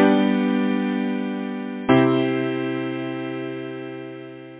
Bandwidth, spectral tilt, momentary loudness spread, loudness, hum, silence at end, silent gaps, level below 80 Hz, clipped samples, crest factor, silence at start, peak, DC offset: 4 kHz; -11 dB/octave; 16 LU; -23 LUFS; none; 0 s; none; -62 dBFS; under 0.1%; 18 dB; 0 s; -4 dBFS; under 0.1%